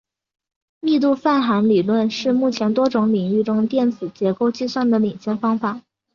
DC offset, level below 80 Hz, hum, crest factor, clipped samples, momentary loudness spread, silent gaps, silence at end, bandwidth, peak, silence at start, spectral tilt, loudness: under 0.1%; -64 dBFS; none; 14 dB; under 0.1%; 6 LU; none; 0.35 s; 7 kHz; -4 dBFS; 0.85 s; -7 dB/octave; -19 LUFS